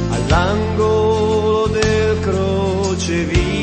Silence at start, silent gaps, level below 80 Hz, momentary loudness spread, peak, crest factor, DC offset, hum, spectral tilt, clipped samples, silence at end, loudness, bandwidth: 0 s; none; -28 dBFS; 3 LU; -2 dBFS; 14 dB; under 0.1%; none; -6 dB/octave; under 0.1%; 0 s; -16 LUFS; 8.8 kHz